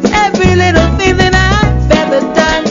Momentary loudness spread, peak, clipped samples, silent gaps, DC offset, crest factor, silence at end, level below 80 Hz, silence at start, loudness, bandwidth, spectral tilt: 2 LU; 0 dBFS; under 0.1%; none; under 0.1%; 10 dB; 0 s; -18 dBFS; 0 s; -9 LUFS; 7.6 kHz; -5.5 dB/octave